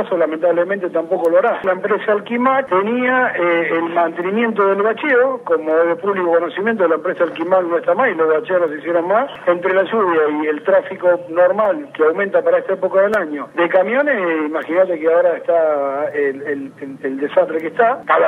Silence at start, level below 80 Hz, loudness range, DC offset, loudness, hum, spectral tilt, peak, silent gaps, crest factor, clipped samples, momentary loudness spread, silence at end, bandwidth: 0 s; -70 dBFS; 1 LU; under 0.1%; -16 LUFS; none; -7 dB/octave; 0 dBFS; none; 16 dB; under 0.1%; 5 LU; 0 s; 4.2 kHz